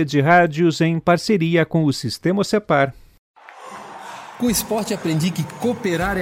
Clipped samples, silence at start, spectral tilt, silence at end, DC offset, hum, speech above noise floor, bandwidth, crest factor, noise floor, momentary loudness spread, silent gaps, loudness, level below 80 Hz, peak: under 0.1%; 0 s; -5.5 dB/octave; 0 s; under 0.1%; none; 20 dB; 16.5 kHz; 18 dB; -38 dBFS; 20 LU; 3.19-3.34 s; -19 LUFS; -46 dBFS; -2 dBFS